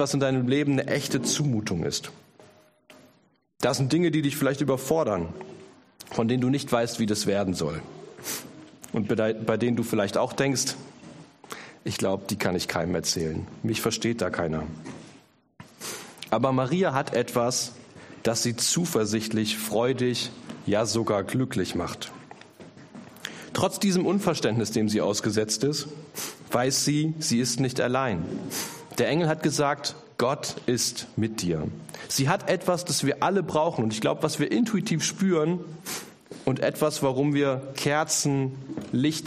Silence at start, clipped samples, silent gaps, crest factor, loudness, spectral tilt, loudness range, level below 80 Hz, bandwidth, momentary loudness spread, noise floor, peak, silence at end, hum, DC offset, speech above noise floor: 0 s; under 0.1%; none; 20 dB; -26 LUFS; -4.5 dB/octave; 3 LU; -58 dBFS; 15.5 kHz; 13 LU; -61 dBFS; -6 dBFS; 0 s; none; under 0.1%; 36 dB